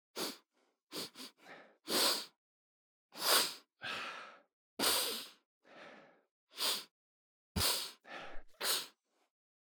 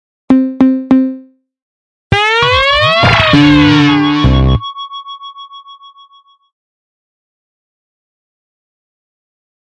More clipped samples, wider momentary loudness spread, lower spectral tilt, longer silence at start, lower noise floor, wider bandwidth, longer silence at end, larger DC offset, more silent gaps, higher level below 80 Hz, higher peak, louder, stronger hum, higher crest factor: neither; first, 25 LU vs 20 LU; second, -1 dB/octave vs -6 dB/octave; second, 0.15 s vs 0.3 s; first, -79 dBFS vs -46 dBFS; first, over 20 kHz vs 9.6 kHz; second, 0.8 s vs 3.95 s; neither; first, 0.82-0.87 s, 2.36-3.09 s, 4.53-4.77 s, 5.45-5.61 s, 6.31-6.47 s, 6.91-7.55 s vs 1.62-2.10 s; second, -62 dBFS vs -26 dBFS; second, -16 dBFS vs 0 dBFS; second, -35 LUFS vs -9 LUFS; neither; first, 26 dB vs 14 dB